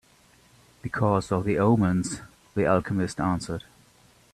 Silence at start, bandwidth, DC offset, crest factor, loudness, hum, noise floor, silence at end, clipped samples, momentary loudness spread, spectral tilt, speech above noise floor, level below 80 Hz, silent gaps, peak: 0.85 s; 13 kHz; under 0.1%; 20 dB; -25 LUFS; none; -58 dBFS; 0.75 s; under 0.1%; 14 LU; -7 dB/octave; 34 dB; -52 dBFS; none; -8 dBFS